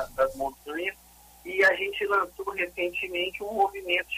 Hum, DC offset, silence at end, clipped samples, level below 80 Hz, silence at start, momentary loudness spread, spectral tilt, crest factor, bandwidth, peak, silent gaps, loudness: none; under 0.1%; 0 s; under 0.1%; -56 dBFS; 0 s; 11 LU; -3 dB/octave; 18 dB; 15.5 kHz; -12 dBFS; none; -27 LUFS